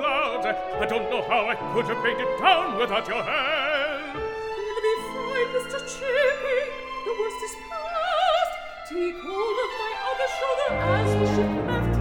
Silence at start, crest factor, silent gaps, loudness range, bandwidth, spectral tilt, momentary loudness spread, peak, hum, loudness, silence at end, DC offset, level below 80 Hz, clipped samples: 0 s; 20 dB; none; 3 LU; 19 kHz; -5 dB/octave; 9 LU; -6 dBFS; none; -25 LUFS; 0 s; under 0.1%; -44 dBFS; under 0.1%